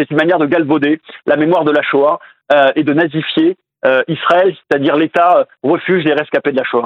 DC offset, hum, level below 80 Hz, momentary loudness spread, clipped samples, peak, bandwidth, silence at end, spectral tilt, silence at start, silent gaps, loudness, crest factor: under 0.1%; none; -62 dBFS; 5 LU; under 0.1%; 0 dBFS; 6.2 kHz; 0 s; -7.5 dB/octave; 0 s; none; -13 LUFS; 12 dB